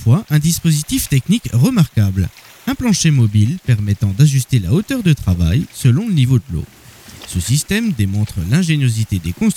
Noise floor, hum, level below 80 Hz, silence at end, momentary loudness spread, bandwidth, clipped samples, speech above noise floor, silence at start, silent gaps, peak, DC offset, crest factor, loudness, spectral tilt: -37 dBFS; none; -34 dBFS; 0 s; 8 LU; 17 kHz; under 0.1%; 23 dB; 0 s; none; -2 dBFS; under 0.1%; 12 dB; -15 LUFS; -5.5 dB/octave